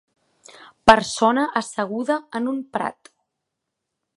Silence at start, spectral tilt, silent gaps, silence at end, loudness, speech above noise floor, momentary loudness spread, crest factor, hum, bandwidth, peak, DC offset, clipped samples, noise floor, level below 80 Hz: 0.85 s; -3.5 dB/octave; none; 1.25 s; -21 LUFS; 60 dB; 12 LU; 22 dB; none; 11.5 kHz; 0 dBFS; under 0.1%; under 0.1%; -81 dBFS; -52 dBFS